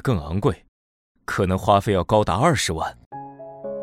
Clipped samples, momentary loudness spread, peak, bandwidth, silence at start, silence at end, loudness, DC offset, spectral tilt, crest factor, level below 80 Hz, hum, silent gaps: under 0.1%; 20 LU; -2 dBFS; 16 kHz; 0.05 s; 0 s; -21 LUFS; under 0.1%; -5.5 dB/octave; 20 dB; -42 dBFS; none; 0.68-1.15 s, 3.06-3.11 s